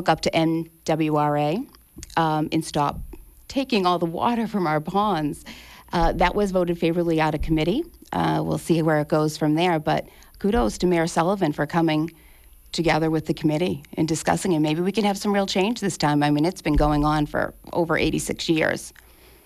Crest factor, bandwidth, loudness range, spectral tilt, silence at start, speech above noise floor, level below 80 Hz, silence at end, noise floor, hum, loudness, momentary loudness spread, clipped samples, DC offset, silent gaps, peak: 14 dB; 14.5 kHz; 2 LU; -5.5 dB/octave; 0 s; 27 dB; -38 dBFS; 0.55 s; -49 dBFS; none; -23 LUFS; 7 LU; under 0.1%; under 0.1%; none; -8 dBFS